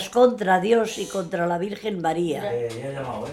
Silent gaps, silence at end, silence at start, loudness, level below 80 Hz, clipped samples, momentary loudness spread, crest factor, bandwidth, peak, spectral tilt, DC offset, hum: none; 0 s; 0 s; -24 LUFS; -60 dBFS; under 0.1%; 11 LU; 18 dB; 14 kHz; -4 dBFS; -5 dB/octave; under 0.1%; none